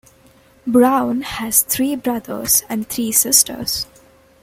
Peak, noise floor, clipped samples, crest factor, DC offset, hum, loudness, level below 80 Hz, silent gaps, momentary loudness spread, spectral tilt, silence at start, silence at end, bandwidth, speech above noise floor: 0 dBFS; -50 dBFS; under 0.1%; 18 dB; under 0.1%; none; -16 LUFS; -50 dBFS; none; 11 LU; -2 dB/octave; 0.65 s; 0.6 s; 16.5 kHz; 33 dB